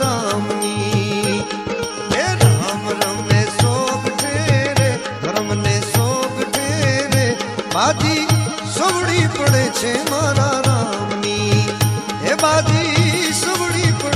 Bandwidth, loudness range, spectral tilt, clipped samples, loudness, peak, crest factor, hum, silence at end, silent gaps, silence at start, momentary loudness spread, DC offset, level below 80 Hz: 15.5 kHz; 1 LU; -4.5 dB/octave; under 0.1%; -17 LUFS; 0 dBFS; 16 dB; none; 0 s; none; 0 s; 6 LU; under 0.1%; -46 dBFS